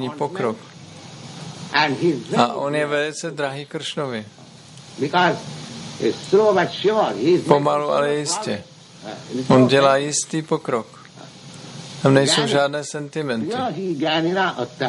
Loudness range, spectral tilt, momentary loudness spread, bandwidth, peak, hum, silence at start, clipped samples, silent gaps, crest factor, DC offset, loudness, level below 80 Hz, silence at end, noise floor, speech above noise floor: 5 LU; -4.5 dB/octave; 21 LU; 11.5 kHz; -2 dBFS; none; 0 s; under 0.1%; none; 20 dB; under 0.1%; -20 LUFS; -64 dBFS; 0 s; -42 dBFS; 23 dB